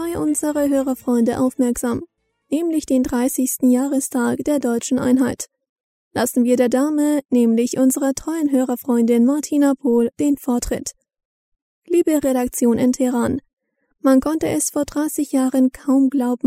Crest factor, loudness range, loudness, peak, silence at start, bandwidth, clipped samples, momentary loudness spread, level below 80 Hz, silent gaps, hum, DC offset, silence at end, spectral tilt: 14 dB; 3 LU; -19 LUFS; -4 dBFS; 0 s; 16 kHz; under 0.1%; 6 LU; -48 dBFS; 5.69-5.76 s, 5.83-6.11 s, 11.25-11.52 s, 11.62-11.82 s, 13.53-13.57 s; none; under 0.1%; 0 s; -4.5 dB/octave